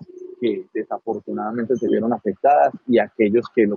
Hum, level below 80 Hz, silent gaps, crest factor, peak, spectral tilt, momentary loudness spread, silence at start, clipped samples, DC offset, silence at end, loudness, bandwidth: none; -72 dBFS; none; 16 dB; -4 dBFS; -8 dB/octave; 10 LU; 0 s; under 0.1%; under 0.1%; 0 s; -21 LUFS; 6.6 kHz